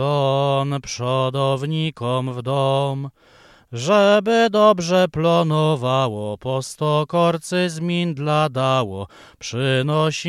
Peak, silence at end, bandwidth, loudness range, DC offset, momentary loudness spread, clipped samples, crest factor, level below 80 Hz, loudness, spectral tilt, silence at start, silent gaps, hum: -2 dBFS; 0 s; 13.5 kHz; 4 LU; under 0.1%; 11 LU; under 0.1%; 18 dB; -56 dBFS; -19 LUFS; -6 dB/octave; 0 s; none; none